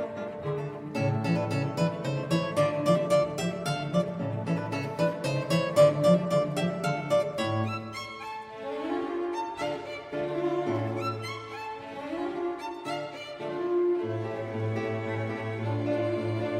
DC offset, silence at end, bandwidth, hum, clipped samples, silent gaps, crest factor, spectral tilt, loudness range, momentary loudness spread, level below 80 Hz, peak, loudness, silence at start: under 0.1%; 0 s; 15.5 kHz; none; under 0.1%; none; 20 dB; -6.5 dB/octave; 7 LU; 12 LU; -64 dBFS; -10 dBFS; -29 LUFS; 0 s